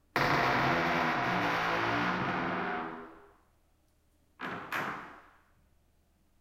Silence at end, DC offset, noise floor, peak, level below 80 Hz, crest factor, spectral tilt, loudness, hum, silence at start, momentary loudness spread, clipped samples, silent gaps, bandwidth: 1.2 s; under 0.1%; -69 dBFS; -12 dBFS; -60 dBFS; 22 dB; -5 dB/octave; -31 LUFS; none; 0.15 s; 16 LU; under 0.1%; none; 16.5 kHz